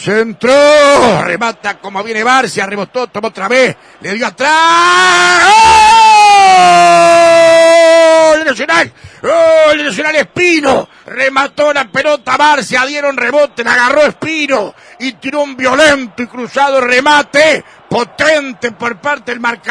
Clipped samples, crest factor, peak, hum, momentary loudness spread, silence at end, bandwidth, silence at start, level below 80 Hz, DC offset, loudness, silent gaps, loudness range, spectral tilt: 0.2%; 8 dB; 0 dBFS; none; 13 LU; 0 s; 11 kHz; 0 s; -44 dBFS; under 0.1%; -8 LUFS; none; 7 LU; -2.5 dB/octave